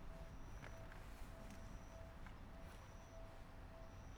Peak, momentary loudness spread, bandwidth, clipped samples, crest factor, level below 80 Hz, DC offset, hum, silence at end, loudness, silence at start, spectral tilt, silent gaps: -40 dBFS; 3 LU; over 20 kHz; under 0.1%; 14 dB; -58 dBFS; under 0.1%; none; 0 s; -58 LUFS; 0 s; -5.5 dB/octave; none